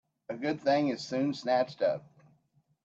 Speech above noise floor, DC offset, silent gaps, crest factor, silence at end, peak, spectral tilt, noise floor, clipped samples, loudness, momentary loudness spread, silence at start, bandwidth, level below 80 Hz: 41 dB; under 0.1%; none; 16 dB; 0.85 s; -16 dBFS; -6 dB/octave; -71 dBFS; under 0.1%; -31 LUFS; 8 LU; 0.3 s; 7.8 kHz; -78 dBFS